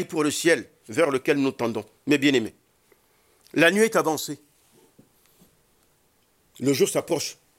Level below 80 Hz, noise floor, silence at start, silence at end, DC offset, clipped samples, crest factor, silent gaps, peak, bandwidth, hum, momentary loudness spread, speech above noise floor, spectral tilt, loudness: -72 dBFS; -65 dBFS; 0 s; 0.25 s; under 0.1%; under 0.1%; 22 dB; none; -4 dBFS; 16.5 kHz; none; 11 LU; 42 dB; -4 dB/octave; -23 LUFS